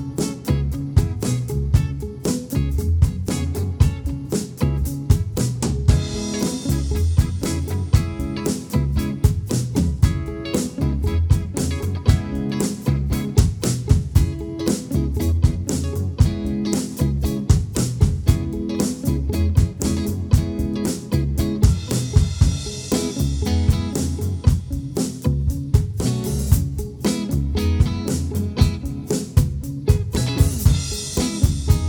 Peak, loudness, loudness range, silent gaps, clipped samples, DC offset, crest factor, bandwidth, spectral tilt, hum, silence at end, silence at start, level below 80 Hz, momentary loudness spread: -2 dBFS; -21 LUFS; 1 LU; none; under 0.1%; under 0.1%; 18 dB; over 20 kHz; -6 dB/octave; none; 0 s; 0 s; -26 dBFS; 5 LU